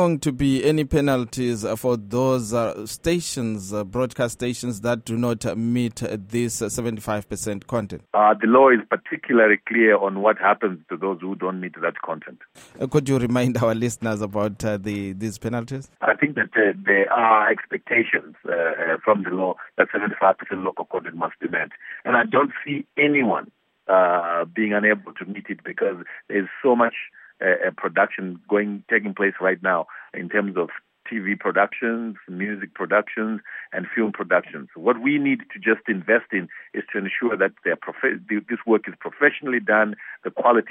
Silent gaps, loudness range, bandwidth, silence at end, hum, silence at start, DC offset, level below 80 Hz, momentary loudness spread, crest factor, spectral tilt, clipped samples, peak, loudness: none; 5 LU; 16 kHz; 0 s; none; 0 s; under 0.1%; -52 dBFS; 11 LU; 20 dB; -5.5 dB/octave; under 0.1%; -2 dBFS; -22 LUFS